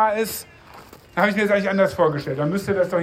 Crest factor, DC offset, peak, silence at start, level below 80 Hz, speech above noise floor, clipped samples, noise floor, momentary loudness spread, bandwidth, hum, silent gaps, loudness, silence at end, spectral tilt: 18 dB; under 0.1%; -4 dBFS; 0 s; -56 dBFS; 24 dB; under 0.1%; -44 dBFS; 10 LU; 16 kHz; none; none; -21 LUFS; 0 s; -5.5 dB/octave